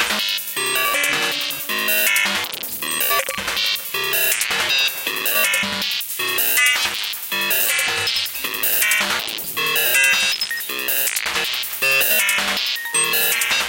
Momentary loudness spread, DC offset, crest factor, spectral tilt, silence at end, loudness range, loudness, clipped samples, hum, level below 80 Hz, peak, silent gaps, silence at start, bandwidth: 7 LU; under 0.1%; 18 dB; 0.5 dB/octave; 0 s; 2 LU; -17 LUFS; under 0.1%; none; -58 dBFS; -2 dBFS; none; 0 s; 17.5 kHz